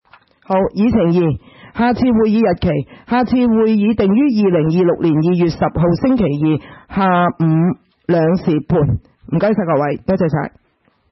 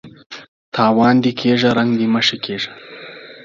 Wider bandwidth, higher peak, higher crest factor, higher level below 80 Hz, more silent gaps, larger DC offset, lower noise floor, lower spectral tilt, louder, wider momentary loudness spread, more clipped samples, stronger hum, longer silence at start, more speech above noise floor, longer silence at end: second, 6 kHz vs 7.4 kHz; about the same, -2 dBFS vs 0 dBFS; about the same, 12 dB vs 16 dB; first, -40 dBFS vs -58 dBFS; second, none vs 0.26-0.30 s, 0.48-0.72 s; neither; first, -59 dBFS vs -36 dBFS; first, -10 dB/octave vs -5.5 dB/octave; about the same, -15 LUFS vs -16 LUFS; second, 6 LU vs 22 LU; neither; neither; first, 0.5 s vs 0.05 s; first, 45 dB vs 21 dB; first, 0.65 s vs 0.05 s